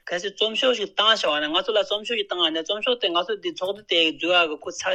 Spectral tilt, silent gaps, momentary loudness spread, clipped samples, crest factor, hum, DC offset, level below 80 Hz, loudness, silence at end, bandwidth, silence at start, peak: -1.5 dB/octave; none; 9 LU; under 0.1%; 20 dB; none; under 0.1%; -66 dBFS; -22 LUFS; 0 s; 11 kHz; 0.05 s; -4 dBFS